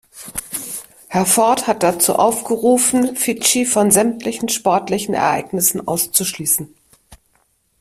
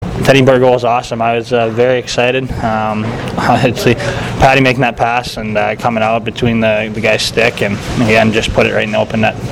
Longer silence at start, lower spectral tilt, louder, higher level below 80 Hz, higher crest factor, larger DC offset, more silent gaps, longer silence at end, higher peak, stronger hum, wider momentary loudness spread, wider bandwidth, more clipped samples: first, 0.15 s vs 0 s; second, -3 dB/octave vs -5.5 dB/octave; second, -16 LUFS vs -12 LUFS; second, -54 dBFS vs -32 dBFS; first, 18 dB vs 12 dB; neither; neither; first, 0.65 s vs 0 s; about the same, 0 dBFS vs 0 dBFS; neither; first, 12 LU vs 7 LU; about the same, 16 kHz vs 16.5 kHz; neither